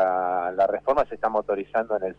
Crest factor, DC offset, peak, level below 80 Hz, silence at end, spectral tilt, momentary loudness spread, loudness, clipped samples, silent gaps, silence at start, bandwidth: 12 dB; under 0.1%; -12 dBFS; -54 dBFS; 0.05 s; -7 dB/octave; 4 LU; -24 LUFS; under 0.1%; none; 0 s; 6.4 kHz